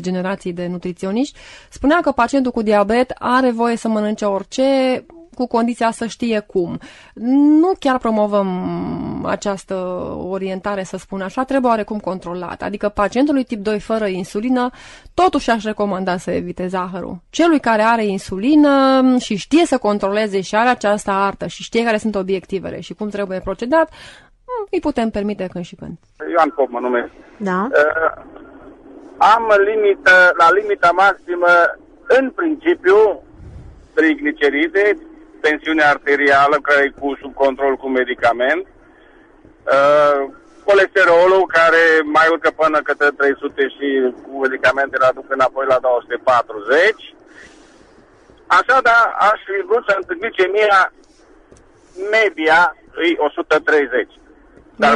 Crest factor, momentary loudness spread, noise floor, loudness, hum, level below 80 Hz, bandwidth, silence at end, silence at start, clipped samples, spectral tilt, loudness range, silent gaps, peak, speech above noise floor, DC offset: 16 dB; 13 LU; -48 dBFS; -16 LUFS; none; -48 dBFS; 11.5 kHz; 0 s; 0 s; under 0.1%; -5 dB/octave; 8 LU; none; -2 dBFS; 32 dB; under 0.1%